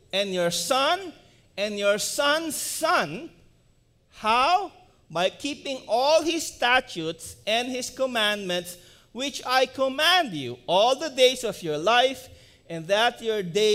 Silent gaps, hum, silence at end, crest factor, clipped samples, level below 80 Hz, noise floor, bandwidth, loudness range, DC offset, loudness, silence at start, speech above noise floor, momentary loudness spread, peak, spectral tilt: none; none; 0 s; 20 dB; under 0.1%; -60 dBFS; -62 dBFS; 16 kHz; 4 LU; under 0.1%; -24 LUFS; 0.15 s; 37 dB; 13 LU; -6 dBFS; -2.5 dB/octave